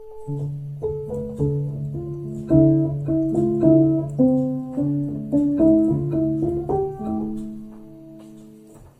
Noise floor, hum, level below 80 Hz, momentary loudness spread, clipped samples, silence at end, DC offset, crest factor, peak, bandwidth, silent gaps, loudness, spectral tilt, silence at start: -45 dBFS; none; -44 dBFS; 14 LU; under 0.1%; 0.15 s; under 0.1%; 18 dB; -2 dBFS; 7.8 kHz; none; -21 LUFS; -11.5 dB/octave; 0 s